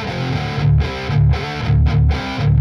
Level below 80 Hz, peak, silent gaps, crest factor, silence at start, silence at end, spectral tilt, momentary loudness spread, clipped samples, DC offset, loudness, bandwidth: -24 dBFS; -4 dBFS; none; 10 dB; 0 s; 0 s; -7.5 dB/octave; 5 LU; under 0.1%; under 0.1%; -17 LUFS; 6.8 kHz